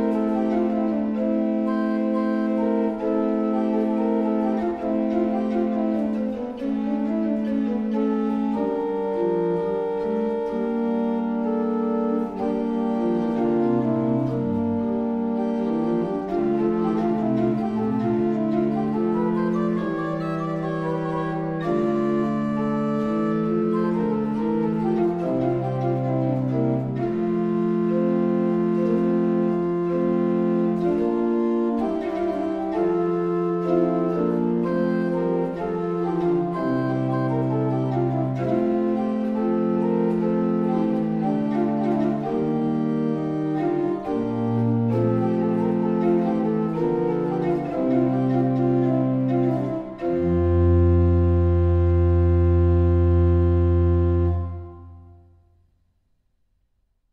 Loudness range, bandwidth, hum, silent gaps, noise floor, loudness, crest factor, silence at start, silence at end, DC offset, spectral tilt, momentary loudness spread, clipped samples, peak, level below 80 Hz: 4 LU; 5.8 kHz; none; none; -68 dBFS; -23 LUFS; 14 dB; 0 s; 2 s; under 0.1%; -10.5 dB/octave; 5 LU; under 0.1%; -8 dBFS; -38 dBFS